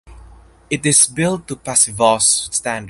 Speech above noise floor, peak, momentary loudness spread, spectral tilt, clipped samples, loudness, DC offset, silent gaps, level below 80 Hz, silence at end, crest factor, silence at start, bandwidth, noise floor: 26 dB; 0 dBFS; 9 LU; -2.5 dB/octave; under 0.1%; -14 LUFS; under 0.1%; none; -46 dBFS; 0 s; 18 dB; 0.1 s; 12 kHz; -43 dBFS